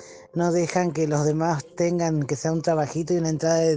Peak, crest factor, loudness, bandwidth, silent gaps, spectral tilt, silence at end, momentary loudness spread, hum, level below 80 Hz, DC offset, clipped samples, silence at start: -8 dBFS; 14 dB; -24 LUFS; 9.8 kHz; none; -6 dB/octave; 0 s; 3 LU; none; -58 dBFS; under 0.1%; under 0.1%; 0 s